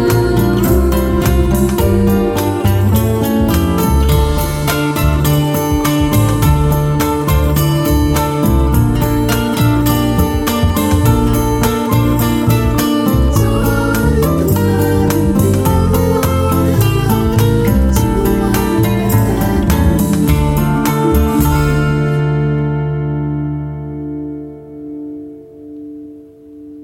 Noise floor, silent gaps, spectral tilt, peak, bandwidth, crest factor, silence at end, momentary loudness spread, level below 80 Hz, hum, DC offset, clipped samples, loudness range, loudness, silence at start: -36 dBFS; none; -6.5 dB/octave; 0 dBFS; 17 kHz; 12 dB; 0 s; 7 LU; -20 dBFS; none; under 0.1%; under 0.1%; 3 LU; -13 LUFS; 0 s